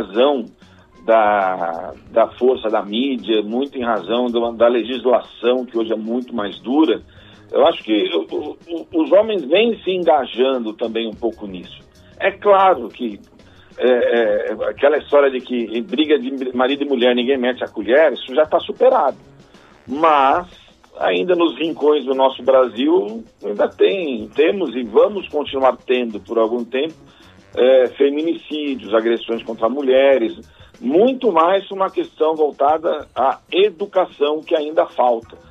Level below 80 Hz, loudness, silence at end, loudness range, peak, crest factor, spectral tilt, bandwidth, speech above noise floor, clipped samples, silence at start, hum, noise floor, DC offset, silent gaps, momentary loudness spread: -58 dBFS; -17 LUFS; 0.15 s; 2 LU; -2 dBFS; 16 dB; -6.5 dB/octave; 6.8 kHz; 29 dB; under 0.1%; 0 s; none; -46 dBFS; under 0.1%; none; 10 LU